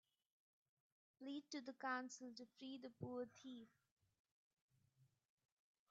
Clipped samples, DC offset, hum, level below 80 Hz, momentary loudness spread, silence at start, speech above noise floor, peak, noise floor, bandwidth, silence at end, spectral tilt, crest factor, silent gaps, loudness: under 0.1%; under 0.1%; none; under -90 dBFS; 12 LU; 1.2 s; 28 dB; -34 dBFS; -80 dBFS; 7.4 kHz; 0.85 s; -3.5 dB/octave; 22 dB; 3.91-3.97 s, 4.19-4.25 s, 4.32-4.69 s; -53 LUFS